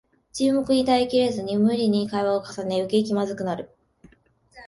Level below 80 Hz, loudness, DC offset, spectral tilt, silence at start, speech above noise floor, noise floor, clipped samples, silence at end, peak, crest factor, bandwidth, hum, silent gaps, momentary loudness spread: -58 dBFS; -23 LUFS; under 0.1%; -6 dB/octave; 0.35 s; 37 dB; -59 dBFS; under 0.1%; 0 s; -8 dBFS; 16 dB; 11.5 kHz; none; none; 9 LU